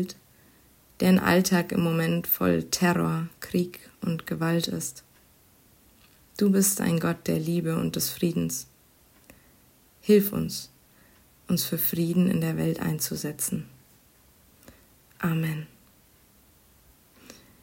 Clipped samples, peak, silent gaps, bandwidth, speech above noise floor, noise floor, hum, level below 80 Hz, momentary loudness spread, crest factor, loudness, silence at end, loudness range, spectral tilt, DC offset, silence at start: under 0.1%; -8 dBFS; none; 16.5 kHz; 34 dB; -59 dBFS; none; -60 dBFS; 14 LU; 20 dB; -26 LUFS; 0.3 s; 9 LU; -5 dB/octave; under 0.1%; 0 s